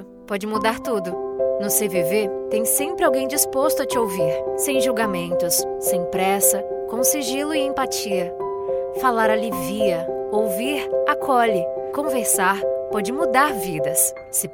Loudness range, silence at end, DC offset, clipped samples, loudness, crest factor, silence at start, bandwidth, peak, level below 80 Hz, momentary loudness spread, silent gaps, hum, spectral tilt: 2 LU; 0 s; under 0.1%; under 0.1%; -21 LUFS; 18 dB; 0 s; 18.5 kHz; -4 dBFS; -54 dBFS; 7 LU; none; none; -3 dB/octave